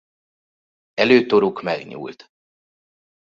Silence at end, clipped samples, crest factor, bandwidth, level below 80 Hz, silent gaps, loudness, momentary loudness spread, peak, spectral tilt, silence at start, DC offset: 1.2 s; under 0.1%; 20 dB; 7.2 kHz; -64 dBFS; none; -18 LUFS; 19 LU; -2 dBFS; -6 dB/octave; 0.95 s; under 0.1%